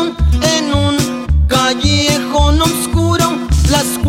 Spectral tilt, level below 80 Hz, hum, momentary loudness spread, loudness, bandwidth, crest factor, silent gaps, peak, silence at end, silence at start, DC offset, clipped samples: -4.5 dB/octave; -18 dBFS; none; 3 LU; -13 LUFS; 16.5 kHz; 12 dB; none; 0 dBFS; 0 s; 0 s; under 0.1%; under 0.1%